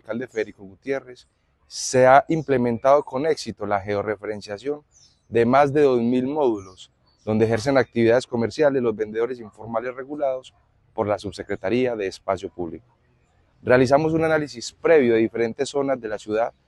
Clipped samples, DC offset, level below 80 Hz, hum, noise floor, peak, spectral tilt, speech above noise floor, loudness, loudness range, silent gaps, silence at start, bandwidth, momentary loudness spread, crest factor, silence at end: under 0.1%; under 0.1%; -56 dBFS; none; -61 dBFS; -2 dBFS; -5.5 dB/octave; 40 dB; -22 LUFS; 6 LU; none; 0.1 s; 12 kHz; 14 LU; 20 dB; 0.2 s